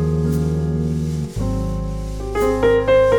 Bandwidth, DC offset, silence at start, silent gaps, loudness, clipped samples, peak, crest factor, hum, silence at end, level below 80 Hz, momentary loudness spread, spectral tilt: 19 kHz; under 0.1%; 0 s; none; -20 LUFS; under 0.1%; -4 dBFS; 14 dB; none; 0 s; -28 dBFS; 10 LU; -7.5 dB/octave